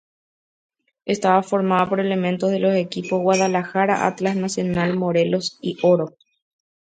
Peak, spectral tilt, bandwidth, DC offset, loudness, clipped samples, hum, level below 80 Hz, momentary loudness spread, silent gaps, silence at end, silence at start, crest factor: -2 dBFS; -5.5 dB/octave; 9.2 kHz; under 0.1%; -20 LUFS; under 0.1%; none; -60 dBFS; 5 LU; none; 0.75 s; 1.05 s; 20 dB